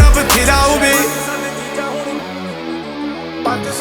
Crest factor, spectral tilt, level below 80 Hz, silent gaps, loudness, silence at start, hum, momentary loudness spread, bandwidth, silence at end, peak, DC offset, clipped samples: 14 dB; -3.5 dB/octave; -20 dBFS; none; -16 LUFS; 0 s; none; 14 LU; over 20 kHz; 0 s; 0 dBFS; under 0.1%; under 0.1%